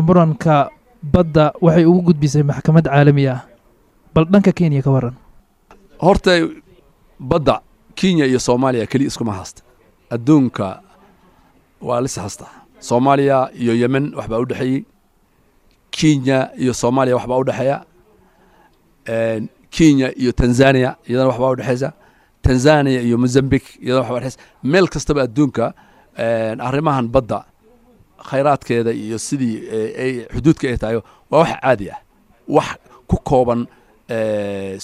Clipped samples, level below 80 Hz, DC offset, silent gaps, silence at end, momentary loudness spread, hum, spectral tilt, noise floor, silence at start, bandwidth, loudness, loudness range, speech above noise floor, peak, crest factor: under 0.1%; -38 dBFS; under 0.1%; none; 0 s; 13 LU; none; -6.5 dB/octave; -57 dBFS; 0 s; 12.5 kHz; -17 LUFS; 6 LU; 41 dB; 0 dBFS; 16 dB